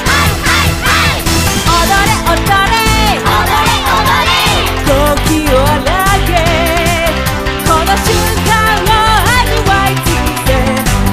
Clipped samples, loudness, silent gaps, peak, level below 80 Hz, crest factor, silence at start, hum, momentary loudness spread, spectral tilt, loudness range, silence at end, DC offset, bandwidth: under 0.1%; -10 LUFS; none; 0 dBFS; -18 dBFS; 10 dB; 0 s; none; 3 LU; -4 dB/octave; 1 LU; 0 s; under 0.1%; 16 kHz